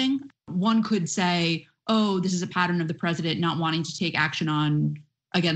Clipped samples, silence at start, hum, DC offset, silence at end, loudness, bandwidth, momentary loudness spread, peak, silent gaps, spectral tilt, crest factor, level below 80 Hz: under 0.1%; 0 s; none; under 0.1%; 0 s; -25 LUFS; 8.8 kHz; 6 LU; -8 dBFS; none; -5 dB/octave; 18 dB; -64 dBFS